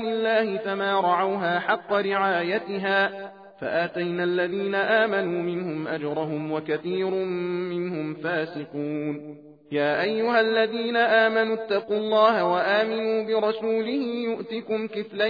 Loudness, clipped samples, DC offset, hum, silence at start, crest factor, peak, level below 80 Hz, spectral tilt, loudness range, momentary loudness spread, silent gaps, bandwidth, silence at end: -24 LUFS; under 0.1%; under 0.1%; none; 0 s; 18 dB; -6 dBFS; -74 dBFS; -7.5 dB/octave; 6 LU; 9 LU; none; 5 kHz; 0 s